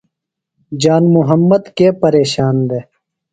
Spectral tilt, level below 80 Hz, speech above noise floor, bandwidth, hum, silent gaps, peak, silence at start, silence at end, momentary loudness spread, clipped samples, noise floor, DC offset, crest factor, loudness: -7 dB/octave; -52 dBFS; 67 dB; 9.2 kHz; none; none; 0 dBFS; 0.7 s; 0.5 s; 8 LU; under 0.1%; -78 dBFS; under 0.1%; 14 dB; -12 LUFS